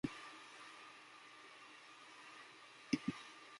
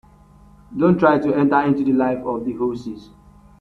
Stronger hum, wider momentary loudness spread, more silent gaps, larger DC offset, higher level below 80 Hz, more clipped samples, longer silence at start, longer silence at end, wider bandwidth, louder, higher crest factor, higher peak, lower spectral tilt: neither; about the same, 15 LU vs 17 LU; neither; neither; second, -78 dBFS vs -52 dBFS; neither; second, 0.05 s vs 0.7 s; second, 0 s vs 0.6 s; first, 11.5 kHz vs 6.4 kHz; second, -50 LUFS vs -18 LUFS; first, 28 dB vs 18 dB; second, -22 dBFS vs -2 dBFS; second, -4.5 dB/octave vs -9 dB/octave